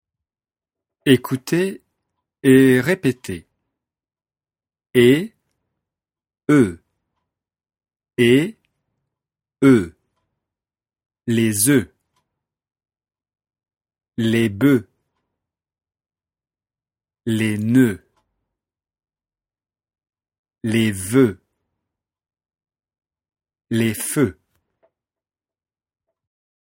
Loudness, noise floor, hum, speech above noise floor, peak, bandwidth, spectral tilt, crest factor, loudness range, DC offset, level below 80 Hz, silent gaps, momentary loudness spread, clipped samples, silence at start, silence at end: -18 LUFS; under -90 dBFS; none; over 74 dB; 0 dBFS; 16.5 kHz; -5.5 dB/octave; 22 dB; 8 LU; under 0.1%; -58 dBFS; 20.39-20.44 s; 16 LU; under 0.1%; 1.05 s; 2.45 s